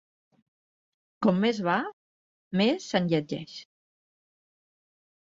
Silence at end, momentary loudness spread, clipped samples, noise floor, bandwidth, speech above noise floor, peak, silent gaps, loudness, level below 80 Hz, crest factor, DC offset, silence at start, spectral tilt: 1.6 s; 14 LU; under 0.1%; under -90 dBFS; 7.8 kHz; over 64 dB; -10 dBFS; 1.93-2.51 s; -27 LUFS; -70 dBFS; 20 dB; under 0.1%; 1.2 s; -6 dB/octave